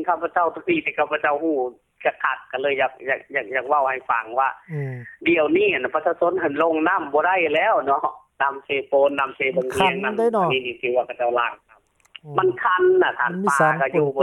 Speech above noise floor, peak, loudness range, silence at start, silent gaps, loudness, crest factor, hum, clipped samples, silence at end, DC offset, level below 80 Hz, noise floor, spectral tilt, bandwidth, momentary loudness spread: 36 dB; -2 dBFS; 3 LU; 0 s; none; -21 LUFS; 18 dB; none; under 0.1%; 0 s; under 0.1%; -62 dBFS; -57 dBFS; -5.5 dB/octave; 12.5 kHz; 7 LU